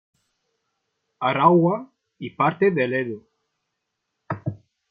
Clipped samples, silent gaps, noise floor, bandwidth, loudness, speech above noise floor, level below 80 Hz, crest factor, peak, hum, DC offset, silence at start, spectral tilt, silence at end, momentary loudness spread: under 0.1%; none; -79 dBFS; 4.9 kHz; -21 LUFS; 59 dB; -68 dBFS; 22 dB; -2 dBFS; none; under 0.1%; 1.2 s; -10 dB/octave; 0.35 s; 19 LU